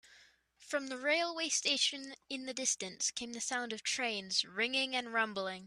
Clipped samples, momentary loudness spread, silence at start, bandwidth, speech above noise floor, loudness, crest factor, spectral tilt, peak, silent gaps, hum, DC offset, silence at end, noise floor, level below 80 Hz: under 0.1%; 8 LU; 0.1 s; 14.5 kHz; 28 dB; -34 LUFS; 20 dB; -0.5 dB/octave; -18 dBFS; none; none; under 0.1%; 0 s; -65 dBFS; -80 dBFS